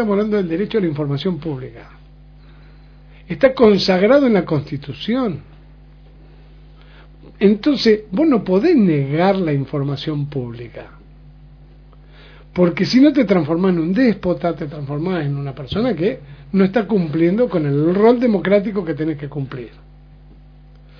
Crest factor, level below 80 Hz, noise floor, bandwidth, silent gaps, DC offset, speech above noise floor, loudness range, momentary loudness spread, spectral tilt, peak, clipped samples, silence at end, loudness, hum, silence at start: 18 dB; -44 dBFS; -43 dBFS; 5.4 kHz; none; under 0.1%; 26 dB; 6 LU; 14 LU; -8 dB/octave; 0 dBFS; under 0.1%; 1.3 s; -17 LUFS; 50 Hz at -40 dBFS; 0 s